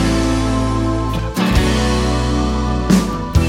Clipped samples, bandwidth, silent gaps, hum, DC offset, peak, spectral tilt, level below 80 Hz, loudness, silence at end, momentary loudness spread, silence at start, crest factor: under 0.1%; 16 kHz; none; none; under 0.1%; 0 dBFS; -6 dB/octave; -22 dBFS; -17 LUFS; 0 s; 4 LU; 0 s; 14 dB